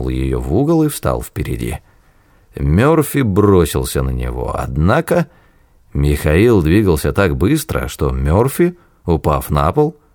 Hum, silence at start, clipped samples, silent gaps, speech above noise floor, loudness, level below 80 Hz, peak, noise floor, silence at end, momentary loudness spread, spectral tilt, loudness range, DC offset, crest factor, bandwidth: none; 0 s; under 0.1%; none; 36 dB; -15 LUFS; -26 dBFS; -2 dBFS; -50 dBFS; 0.2 s; 10 LU; -7 dB/octave; 2 LU; under 0.1%; 14 dB; over 20 kHz